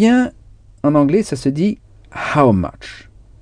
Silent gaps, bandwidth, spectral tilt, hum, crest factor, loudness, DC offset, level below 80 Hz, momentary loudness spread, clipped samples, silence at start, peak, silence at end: none; 10 kHz; -7 dB/octave; none; 16 dB; -16 LUFS; under 0.1%; -42 dBFS; 19 LU; under 0.1%; 0 s; 0 dBFS; 0.45 s